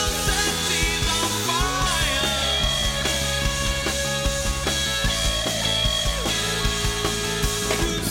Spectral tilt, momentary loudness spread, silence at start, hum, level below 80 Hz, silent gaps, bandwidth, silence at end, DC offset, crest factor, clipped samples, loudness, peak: -2.5 dB/octave; 3 LU; 0 s; none; -30 dBFS; none; 16.5 kHz; 0 s; under 0.1%; 16 dB; under 0.1%; -22 LUFS; -8 dBFS